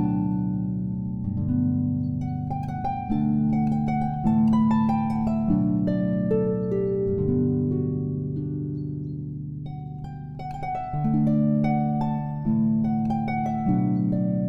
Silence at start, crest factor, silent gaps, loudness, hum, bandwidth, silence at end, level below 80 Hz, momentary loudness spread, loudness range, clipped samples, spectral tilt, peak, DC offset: 0 s; 12 dB; none; -25 LUFS; none; 5.6 kHz; 0 s; -44 dBFS; 10 LU; 5 LU; under 0.1%; -11 dB/octave; -12 dBFS; under 0.1%